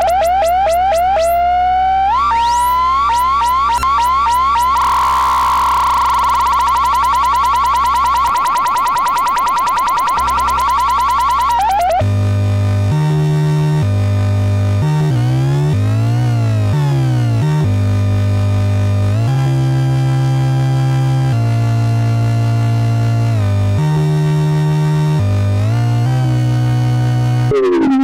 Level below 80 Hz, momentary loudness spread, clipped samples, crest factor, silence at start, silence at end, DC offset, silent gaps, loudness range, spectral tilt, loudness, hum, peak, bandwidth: -34 dBFS; 2 LU; under 0.1%; 6 dB; 0 s; 0 s; under 0.1%; none; 2 LU; -6.5 dB/octave; -14 LUFS; none; -6 dBFS; 17 kHz